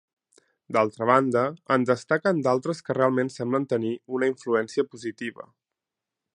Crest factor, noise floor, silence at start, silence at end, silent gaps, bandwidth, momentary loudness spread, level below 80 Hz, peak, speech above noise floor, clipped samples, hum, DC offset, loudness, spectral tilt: 22 dB; -88 dBFS; 0.7 s; 0.95 s; none; 10.5 kHz; 9 LU; -72 dBFS; -4 dBFS; 63 dB; under 0.1%; none; under 0.1%; -25 LUFS; -6.5 dB/octave